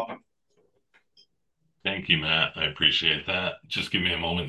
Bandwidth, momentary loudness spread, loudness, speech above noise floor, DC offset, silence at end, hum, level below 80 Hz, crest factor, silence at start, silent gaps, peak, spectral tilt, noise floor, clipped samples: 12.5 kHz; 10 LU; -24 LUFS; 49 dB; under 0.1%; 0 s; none; -50 dBFS; 24 dB; 0 s; none; -4 dBFS; -4.5 dB/octave; -75 dBFS; under 0.1%